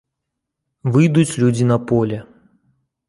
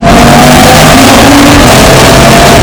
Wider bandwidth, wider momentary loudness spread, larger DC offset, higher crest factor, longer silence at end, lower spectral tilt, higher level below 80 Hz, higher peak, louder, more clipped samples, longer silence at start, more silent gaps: second, 11.5 kHz vs over 20 kHz; first, 11 LU vs 0 LU; neither; first, 16 dB vs 0 dB; first, 0.85 s vs 0 s; first, -7 dB/octave vs -4 dB/octave; second, -52 dBFS vs -14 dBFS; about the same, -2 dBFS vs 0 dBFS; second, -17 LUFS vs -1 LUFS; second, under 0.1% vs 80%; first, 0.85 s vs 0 s; neither